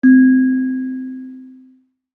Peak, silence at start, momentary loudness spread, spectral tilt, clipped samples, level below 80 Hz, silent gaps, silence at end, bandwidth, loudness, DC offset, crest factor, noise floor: -2 dBFS; 0.05 s; 22 LU; -9.5 dB/octave; under 0.1%; -72 dBFS; none; 0.65 s; 1.8 kHz; -14 LUFS; under 0.1%; 14 dB; -52 dBFS